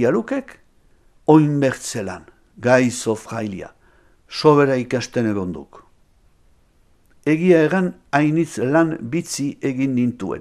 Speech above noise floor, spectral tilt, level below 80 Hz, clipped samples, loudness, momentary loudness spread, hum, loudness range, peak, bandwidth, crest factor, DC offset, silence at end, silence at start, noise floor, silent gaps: 38 dB; -6 dB/octave; -56 dBFS; under 0.1%; -19 LUFS; 14 LU; none; 3 LU; 0 dBFS; 14.5 kHz; 20 dB; under 0.1%; 0 s; 0 s; -56 dBFS; none